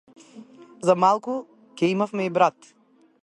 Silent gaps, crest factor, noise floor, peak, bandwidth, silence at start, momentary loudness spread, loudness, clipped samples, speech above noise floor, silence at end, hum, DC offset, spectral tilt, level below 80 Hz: none; 22 dB; -46 dBFS; -4 dBFS; 11.5 kHz; 0.35 s; 8 LU; -23 LUFS; under 0.1%; 25 dB; 0.75 s; none; under 0.1%; -6 dB/octave; -74 dBFS